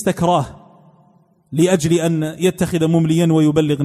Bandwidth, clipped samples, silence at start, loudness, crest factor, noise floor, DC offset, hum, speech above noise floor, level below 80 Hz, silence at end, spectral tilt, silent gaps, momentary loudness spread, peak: 14 kHz; under 0.1%; 0 s; -16 LUFS; 14 dB; -54 dBFS; under 0.1%; none; 39 dB; -48 dBFS; 0 s; -6.5 dB/octave; none; 5 LU; -2 dBFS